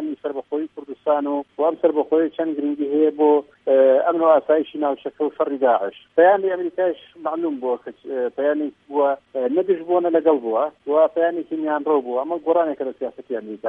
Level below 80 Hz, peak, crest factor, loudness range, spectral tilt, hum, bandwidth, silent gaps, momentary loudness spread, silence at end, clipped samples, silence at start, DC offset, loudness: -72 dBFS; -4 dBFS; 16 dB; 4 LU; -8 dB/octave; none; 3.8 kHz; none; 11 LU; 0 s; under 0.1%; 0 s; under 0.1%; -21 LUFS